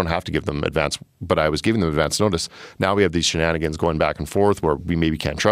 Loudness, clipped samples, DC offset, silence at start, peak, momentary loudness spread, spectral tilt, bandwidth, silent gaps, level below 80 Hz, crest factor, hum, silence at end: -21 LUFS; under 0.1%; under 0.1%; 0 s; -2 dBFS; 6 LU; -5 dB/octave; 15.5 kHz; none; -38 dBFS; 18 dB; none; 0 s